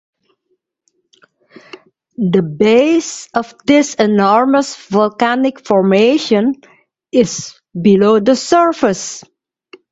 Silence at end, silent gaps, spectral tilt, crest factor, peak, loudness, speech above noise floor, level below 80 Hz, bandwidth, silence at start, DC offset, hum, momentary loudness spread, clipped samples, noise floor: 0.7 s; none; -5 dB/octave; 14 dB; 0 dBFS; -13 LUFS; 54 dB; -56 dBFS; 8.2 kHz; 2.2 s; under 0.1%; none; 10 LU; under 0.1%; -67 dBFS